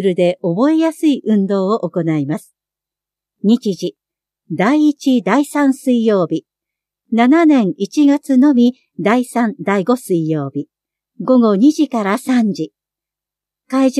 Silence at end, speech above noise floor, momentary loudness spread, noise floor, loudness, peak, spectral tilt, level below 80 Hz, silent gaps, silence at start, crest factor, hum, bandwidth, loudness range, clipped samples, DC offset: 0 s; 72 dB; 11 LU; -86 dBFS; -15 LUFS; 0 dBFS; -6.5 dB/octave; -72 dBFS; none; 0 s; 14 dB; none; 13.5 kHz; 4 LU; under 0.1%; under 0.1%